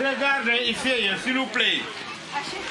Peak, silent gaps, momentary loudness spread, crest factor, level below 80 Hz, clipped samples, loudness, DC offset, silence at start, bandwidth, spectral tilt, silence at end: -8 dBFS; none; 10 LU; 18 dB; -62 dBFS; under 0.1%; -23 LUFS; under 0.1%; 0 s; 11.5 kHz; -2.5 dB/octave; 0 s